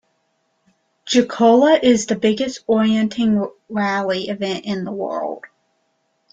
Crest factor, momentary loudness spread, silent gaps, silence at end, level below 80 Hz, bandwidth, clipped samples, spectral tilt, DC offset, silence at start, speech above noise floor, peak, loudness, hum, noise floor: 16 dB; 12 LU; none; 0.85 s; -60 dBFS; 9.2 kHz; under 0.1%; -5 dB/octave; under 0.1%; 1.05 s; 50 dB; -2 dBFS; -18 LUFS; none; -67 dBFS